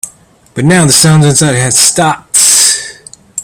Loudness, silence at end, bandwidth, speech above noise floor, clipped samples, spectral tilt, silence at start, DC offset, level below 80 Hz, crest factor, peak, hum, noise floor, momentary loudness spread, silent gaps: -6 LUFS; 0 s; over 20 kHz; 33 dB; 1%; -3 dB/octave; 0.05 s; under 0.1%; -42 dBFS; 8 dB; 0 dBFS; none; -40 dBFS; 19 LU; none